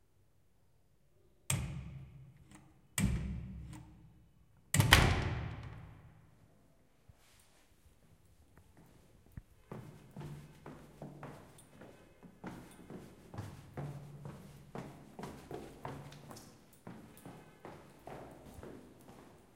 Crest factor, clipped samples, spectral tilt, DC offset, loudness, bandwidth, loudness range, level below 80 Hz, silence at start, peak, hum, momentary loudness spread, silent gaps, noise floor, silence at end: 38 dB; under 0.1%; -4 dB/octave; under 0.1%; -37 LUFS; 16 kHz; 20 LU; -50 dBFS; 1.5 s; -4 dBFS; none; 22 LU; none; -72 dBFS; 0.15 s